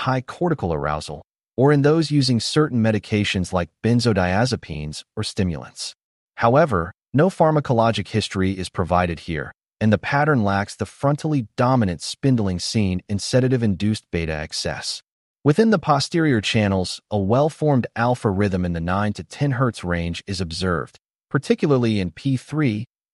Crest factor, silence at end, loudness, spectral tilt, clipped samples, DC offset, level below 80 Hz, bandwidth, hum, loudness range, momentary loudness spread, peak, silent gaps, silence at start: 16 dB; 0.3 s; -21 LUFS; -6 dB/octave; under 0.1%; under 0.1%; -46 dBFS; 11.5 kHz; none; 3 LU; 10 LU; -4 dBFS; 6.04-6.28 s, 15.12-15.35 s; 0 s